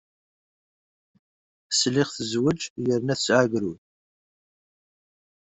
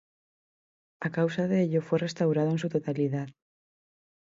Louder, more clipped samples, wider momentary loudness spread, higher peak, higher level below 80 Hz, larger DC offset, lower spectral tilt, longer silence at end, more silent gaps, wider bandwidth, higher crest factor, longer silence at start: first, -24 LUFS vs -28 LUFS; neither; about the same, 7 LU vs 8 LU; first, -6 dBFS vs -14 dBFS; first, -64 dBFS vs -72 dBFS; neither; second, -4 dB/octave vs -7.5 dB/octave; first, 1.65 s vs 0.9 s; first, 2.70-2.76 s vs none; about the same, 8.2 kHz vs 7.8 kHz; first, 22 dB vs 16 dB; first, 1.7 s vs 1 s